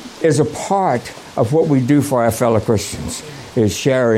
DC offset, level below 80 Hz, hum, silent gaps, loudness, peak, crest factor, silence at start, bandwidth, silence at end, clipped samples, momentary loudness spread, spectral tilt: under 0.1%; -44 dBFS; none; none; -17 LUFS; -2 dBFS; 14 dB; 0 s; 16.5 kHz; 0 s; under 0.1%; 10 LU; -6 dB/octave